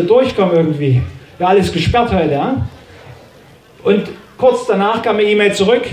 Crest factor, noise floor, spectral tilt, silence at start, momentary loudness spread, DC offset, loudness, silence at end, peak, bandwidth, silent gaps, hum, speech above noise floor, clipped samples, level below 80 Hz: 14 dB; -43 dBFS; -6.5 dB/octave; 0 s; 8 LU; under 0.1%; -14 LUFS; 0 s; 0 dBFS; 15 kHz; none; none; 30 dB; under 0.1%; -36 dBFS